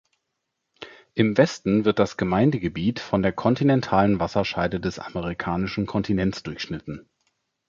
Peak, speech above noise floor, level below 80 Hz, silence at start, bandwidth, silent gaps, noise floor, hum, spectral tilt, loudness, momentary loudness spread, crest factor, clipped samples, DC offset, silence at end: -4 dBFS; 57 dB; -48 dBFS; 0.8 s; 7.6 kHz; none; -79 dBFS; none; -7 dB/octave; -23 LUFS; 12 LU; 20 dB; under 0.1%; under 0.1%; 0.7 s